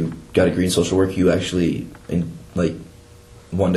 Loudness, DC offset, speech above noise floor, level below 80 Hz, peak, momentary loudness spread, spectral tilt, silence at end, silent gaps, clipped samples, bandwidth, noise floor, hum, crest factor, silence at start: -20 LUFS; under 0.1%; 25 dB; -44 dBFS; -2 dBFS; 10 LU; -6 dB/octave; 0 s; none; under 0.1%; 12.5 kHz; -45 dBFS; none; 18 dB; 0 s